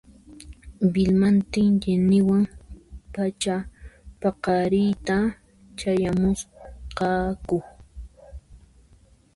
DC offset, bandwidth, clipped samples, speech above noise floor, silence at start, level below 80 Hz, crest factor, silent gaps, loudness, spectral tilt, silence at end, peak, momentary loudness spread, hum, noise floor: under 0.1%; 11.5 kHz; under 0.1%; 34 dB; 0.3 s; -44 dBFS; 14 dB; none; -23 LUFS; -7 dB/octave; 0.8 s; -10 dBFS; 19 LU; none; -56 dBFS